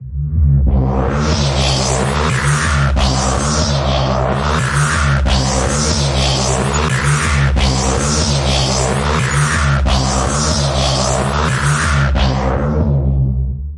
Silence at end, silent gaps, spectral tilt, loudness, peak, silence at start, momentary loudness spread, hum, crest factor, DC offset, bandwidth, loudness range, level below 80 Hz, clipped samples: 0 s; none; -4.5 dB/octave; -15 LUFS; -2 dBFS; 0 s; 2 LU; none; 12 dB; under 0.1%; 11.5 kHz; 1 LU; -20 dBFS; under 0.1%